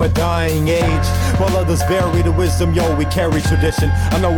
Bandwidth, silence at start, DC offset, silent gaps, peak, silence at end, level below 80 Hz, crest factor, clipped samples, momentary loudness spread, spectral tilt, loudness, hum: 18 kHz; 0 s; under 0.1%; none; -6 dBFS; 0 s; -24 dBFS; 8 dB; under 0.1%; 1 LU; -6 dB/octave; -16 LUFS; none